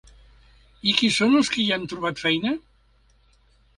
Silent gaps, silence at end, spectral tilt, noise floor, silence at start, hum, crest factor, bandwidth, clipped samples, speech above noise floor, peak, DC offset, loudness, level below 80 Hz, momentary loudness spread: none; 1.2 s; -3.5 dB/octave; -59 dBFS; 0.85 s; none; 20 dB; 11.5 kHz; under 0.1%; 38 dB; -6 dBFS; under 0.1%; -22 LUFS; -56 dBFS; 10 LU